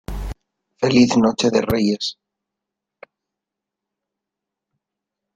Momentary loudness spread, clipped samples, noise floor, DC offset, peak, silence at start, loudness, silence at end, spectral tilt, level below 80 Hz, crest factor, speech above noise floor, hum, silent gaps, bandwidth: 17 LU; under 0.1%; -84 dBFS; under 0.1%; -2 dBFS; 0.1 s; -18 LUFS; 3.25 s; -5 dB/octave; -40 dBFS; 20 dB; 68 dB; none; none; 15 kHz